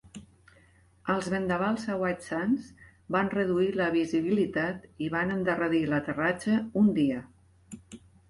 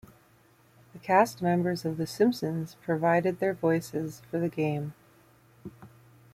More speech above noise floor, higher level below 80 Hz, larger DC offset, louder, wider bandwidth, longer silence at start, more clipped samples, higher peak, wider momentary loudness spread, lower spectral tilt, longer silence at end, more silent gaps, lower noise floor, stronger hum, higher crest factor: about the same, 33 dB vs 34 dB; first, -60 dBFS vs -66 dBFS; neither; about the same, -28 LUFS vs -28 LUFS; second, 11.5 kHz vs 16 kHz; second, 0.15 s vs 0.95 s; neither; about the same, -12 dBFS vs -10 dBFS; second, 13 LU vs 18 LU; about the same, -6.5 dB/octave vs -6.5 dB/octave; about the same, 0.35 s vs 0.45 s; neither; about the same, -60 dBFS vs -61 dBFS; neither; about the same, 16 dB vs 20 dB